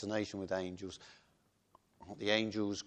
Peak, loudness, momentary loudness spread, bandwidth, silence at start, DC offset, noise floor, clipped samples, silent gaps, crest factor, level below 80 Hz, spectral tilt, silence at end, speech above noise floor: -16 dBFS; -37 LUFS; 20 LU; 9.2 kHz; 0 s; under 0.1%; -74 dBFS; under 0.1%; none; 24 dB; -72 dBFS; -4.5 dB/octave; 0 s; 36 dB